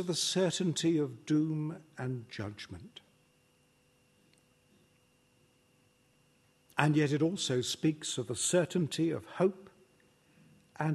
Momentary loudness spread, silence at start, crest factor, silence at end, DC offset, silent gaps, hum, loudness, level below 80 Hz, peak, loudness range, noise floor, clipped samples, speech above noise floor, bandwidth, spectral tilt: 13 LU; 0 s; 26 dB; 0 s; under 0.1%; none; none; -32 LUFS; -74 dBFS; -8 dBFS; 15 LU; -69 dBFS; under 0.1%; 37 dB; 12.5 kHz; -4.5 dB/octave